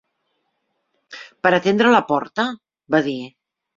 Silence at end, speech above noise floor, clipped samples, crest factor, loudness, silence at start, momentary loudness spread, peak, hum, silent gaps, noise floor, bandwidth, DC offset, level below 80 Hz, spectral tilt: 0.5 s; 54 dB; under 0.1%; 20 dB; -18 LUFS; 1.1 s; 23 LU; -2 dBFS; none; none; -72 dBFS; 7.6 kHz; under 0.1%; -66 dBFS; -5.5 dB/octave